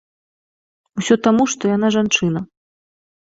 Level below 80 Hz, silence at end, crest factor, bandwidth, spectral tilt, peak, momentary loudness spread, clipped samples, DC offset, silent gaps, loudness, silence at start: -56 dBFS; 0.8 s; 18 dB; 8 kHz; -4.5 dB/octave; -2 dBFS; 13 LU; under 0.1%; under 0.1%; none; -17 LUFS; 0.95 s